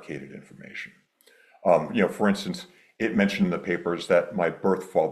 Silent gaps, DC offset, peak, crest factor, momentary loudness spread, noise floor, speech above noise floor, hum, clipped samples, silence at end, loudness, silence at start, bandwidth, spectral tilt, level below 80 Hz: none; under 0.1%; -6 dBFS; 20 dB; 16 LU; -58 dBFS; 33 dB; none; under 0.1%; 0 s; -25 LUFS; 0 s; 13 kHz; -6.5 dB/octave; -64 dBFS